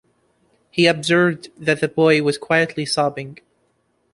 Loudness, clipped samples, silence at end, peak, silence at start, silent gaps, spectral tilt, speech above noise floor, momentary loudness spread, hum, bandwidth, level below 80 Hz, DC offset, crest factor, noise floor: -18 LUFS; under 0.1%; 0.8 s; -2 dBFS; 0.75 s; none; -5 dB/octave; 47 dB; 10 LU; none; 11.5 kHz; -60 dBFS; under 0.1%; 18 dB; -66 dBFS